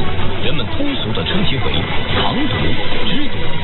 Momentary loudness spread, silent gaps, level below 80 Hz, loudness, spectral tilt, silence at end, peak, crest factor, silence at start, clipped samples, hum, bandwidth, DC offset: 3 LU; none; -26 dBFS; -19 LUFS; -10.5 dB/octave; 0 s; -2 dBFS; 10 dB; 0 s; under 0.1%; none; 4.3 kHz; under 0.1%